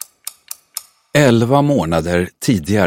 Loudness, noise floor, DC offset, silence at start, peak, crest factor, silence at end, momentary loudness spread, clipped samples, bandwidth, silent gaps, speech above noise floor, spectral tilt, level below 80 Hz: -15 LUFS; -34 dBFS; under 0.1%; 0.75 s; 0 dBFS; 16 dB; 0 s; 18 LU; under 0.1%; 16.5 kHz; none; 21 dB; -6 dB/octave; -42 dBFS